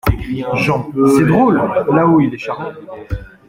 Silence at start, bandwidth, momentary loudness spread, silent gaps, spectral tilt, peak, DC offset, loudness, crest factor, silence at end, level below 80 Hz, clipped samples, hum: 0.05 s; 16.5 kHz; 16 LU; none; -7.5 dB/octave; -2 dBFS; under 0.1%; -14 LUFS; 12 dB; 0.2 s; -32 dBFS; under 0.1%; none